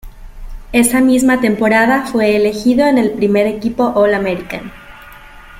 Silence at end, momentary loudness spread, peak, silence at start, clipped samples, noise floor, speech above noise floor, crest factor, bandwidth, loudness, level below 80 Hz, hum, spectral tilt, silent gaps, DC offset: 0 s; 8 LU; 0 dBFS; 0.05 s; under 0.1%; -36 dBFS; 24 dB; 14 dB; 16 kHz; -13 LUFS; -36 dBFS; none; -4.5 dB/octave; none; under 0.1%